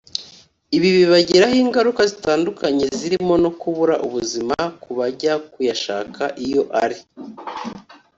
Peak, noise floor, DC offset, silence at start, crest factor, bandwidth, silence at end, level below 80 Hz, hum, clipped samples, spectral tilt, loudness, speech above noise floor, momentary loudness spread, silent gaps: -2 dBFS; -47 dBFS; under 0.1%; 0.15 s; 18 dB; 7.8 kHz; 0.25 s; -54 dBFS; none; under 0.1%; -4.5 dB/octave; -18 LUFS; 29 dB; 16 LU; none